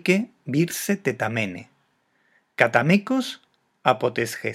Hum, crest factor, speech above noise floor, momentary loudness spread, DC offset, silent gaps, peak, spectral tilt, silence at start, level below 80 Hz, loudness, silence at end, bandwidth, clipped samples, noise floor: none; 24 dB; 45 dB; 12 LU; under 0.1%; none; 0 dBFS; -5 dB/octave; 0.05 s; -70 dBFS; -23 LUFS; 0 s; 16.5 kHz; under 0.1%; -67 dBFS